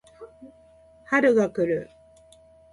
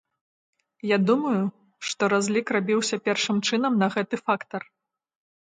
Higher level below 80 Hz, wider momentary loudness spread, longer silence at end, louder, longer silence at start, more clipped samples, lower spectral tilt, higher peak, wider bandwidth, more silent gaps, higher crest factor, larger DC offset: first, -62 dBFS vs -74 dBFS; first, 26 LU vs 10 LU; about the same, 0.9 s vs 1 s; about the same, -23 LUFS vs -24 LUFS; second, 0.2 s vs 0.85 s; neither; first, -6.5 dB/octave vs -4.5 dB/octave; about the same, -6 dBFS vs -8 dBFS; first, 11.5 kHz vs 9.6 kHz; neither; about the same, 20 dB vs 18 dB; neither